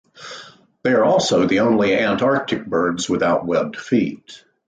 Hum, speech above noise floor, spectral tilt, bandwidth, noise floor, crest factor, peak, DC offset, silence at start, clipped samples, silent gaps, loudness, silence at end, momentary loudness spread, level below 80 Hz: none; 25 dB; -5 dB/octave; 9.4 kHz; -42 dBFS; 14 dB; -6 dBFS; under 0.1%; 0.2 s; under 0.1%; none; -18 LUFS; 0.3 s; 19 LU; -54 dBFS